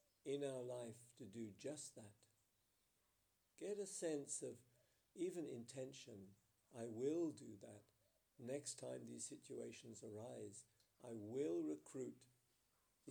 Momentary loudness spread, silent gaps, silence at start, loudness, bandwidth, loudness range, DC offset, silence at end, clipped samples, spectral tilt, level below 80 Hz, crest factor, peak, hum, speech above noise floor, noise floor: 17 LU; none; 0.25 s; -51 LUFS; over 20 kHz; 3 LU; under 0.1%; 0 s; under 0.1%; -4.5 dB/octave; under -90 dBFS; 18 dB; -34 dBFS; none; 34 dB; -84 dBFS